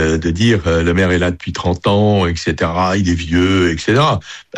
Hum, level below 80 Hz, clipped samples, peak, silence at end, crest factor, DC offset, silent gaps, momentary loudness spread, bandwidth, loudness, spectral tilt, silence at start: none; -32 dBFS; under 0.1%; -2 dBFS; 0 s; 12 dB; under 0.1%; none; 5 LU; 10 kHz; -15 LUFS; -6 dB/octave; 0 s